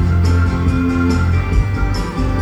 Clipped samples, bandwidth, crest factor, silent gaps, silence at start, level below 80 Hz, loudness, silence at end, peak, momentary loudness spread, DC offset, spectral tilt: under 0.1%; 9 kHz; 12 dB; none; 0 s; -20 dBFS; -16 LUFS; 0 s; -2 dBFS; 5 LU; under 0.1%; -7.5 dB/octave